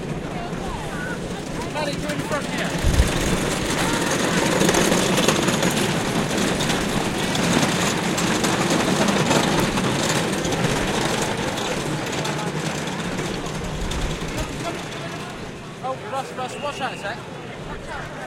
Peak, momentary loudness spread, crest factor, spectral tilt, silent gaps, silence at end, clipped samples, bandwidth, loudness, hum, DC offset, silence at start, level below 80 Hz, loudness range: -4 dBFS; 11 LU; 20 dB; -4 dB/octave; none; 0 s; under 0.1%; 17 kHz; -22 LUFS; none; under 0.1%; 0 s; -36 dBFS; 9 LU